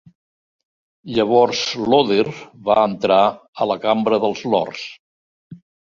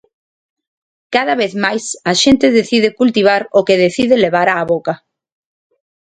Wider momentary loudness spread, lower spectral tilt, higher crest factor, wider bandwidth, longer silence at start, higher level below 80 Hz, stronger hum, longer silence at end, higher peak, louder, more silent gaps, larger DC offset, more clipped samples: first, 10 LU vs 7 LU; about the same, -5 dB/octave vs -4 dB/octave; about the same, 18 dB vs 14 dB; second, 7.4 kHz vs 9.4 kHz; about the same, 1.05 s vs 1.1 s; second, -58 dBFS vs -50 dBFS; neither; second, 0.35 s vs 1.15 s; about the same, -2 dBFS vs 0 dBFS; second, -18 LUFS vs -13 LUFS; first, 3.48-3.53 s, 4.99-5.51 s vs none; neither; neither